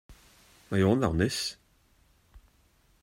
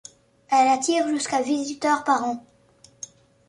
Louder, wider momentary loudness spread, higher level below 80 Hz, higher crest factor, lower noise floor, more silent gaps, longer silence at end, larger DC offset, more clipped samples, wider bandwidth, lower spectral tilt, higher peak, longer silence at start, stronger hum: second, -28 LUFS vs -22 LUFS; second, 8 LU vs 21 LU; first, -52 dBFS vs -70 dBFS; about the same, 20 dB vs 18 dB; first, -65 dBFS vs -56 dBFS; neither; second, 0.65 s vs 1.1 s; neither; neither; first, 16 kHz vs 11.5 kHz; first, -5.5 dB/octave vs -2 dB/octave; second, -10 dBFS vs -6 dBFS; second, 0.1 s vs 0.5 s; neither